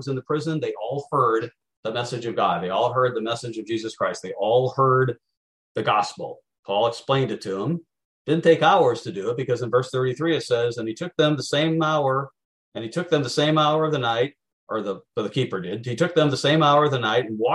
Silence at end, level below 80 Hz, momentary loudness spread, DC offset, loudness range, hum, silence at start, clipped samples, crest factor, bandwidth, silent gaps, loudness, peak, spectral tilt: 0 s; -66 dBFS; 11 LU; under 0.1%; 3 LU; none; 0 s; under 0.1%; 18 dB; 11.5 kHz; 1.77-1.83 s, 5.37-5.75 s, 6.59-6.63 s, 8.05-8.25 s, 12.45-12.72 s, 14.53-14.67 s; -23 LUFS; -6 dBFS; -5.5 dB/octave